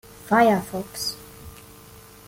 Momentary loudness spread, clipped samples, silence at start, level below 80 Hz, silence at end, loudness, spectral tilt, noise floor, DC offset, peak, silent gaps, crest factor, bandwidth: 25 LU; under 0.1%; 0.25 s; -54 dBFS; 0.75 s; -22 LUFS; -4.5 dB/octave; -46 dBFS; under 0.1%; -6 dBFS; none; 18 dB; 17 kHz